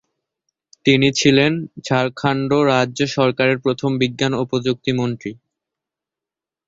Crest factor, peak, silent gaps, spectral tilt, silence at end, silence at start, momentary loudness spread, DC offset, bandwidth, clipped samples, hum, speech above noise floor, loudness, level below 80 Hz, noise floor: 18 dB; -2 dBFS; none; -5 dB/octave; 1.35 s; 0.85 s; 7 LU; under 0.1%; 7.8 kHz; under 0.1%; none; 70 dB; -18 LUFS; -56 dBFS; -88 dBFS